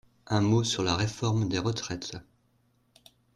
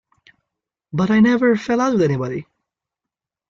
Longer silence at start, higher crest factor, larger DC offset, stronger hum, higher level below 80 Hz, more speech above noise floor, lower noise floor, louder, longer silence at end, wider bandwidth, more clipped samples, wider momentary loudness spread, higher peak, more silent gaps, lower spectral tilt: second, 0.25 s vs 0.95 s; about the same, 16 dB vs 16 dB; neither; neither; about the same, -56 dBFS vs -56 dBFS; second, 41 dB vs 69 dB; second, -69 dBFS vs -86 dBFS; second, -28 LUFS vs -18 LUFS; about the same, 1.15 s vs 1.1 s; first, 11 kHz vs 7.4 kHz; neither; about the same, 12 LU vs 13 LU; second, -14 dBFS vs -4 dBFS; neither; second, -5 dB/octave vs -7 dB/octave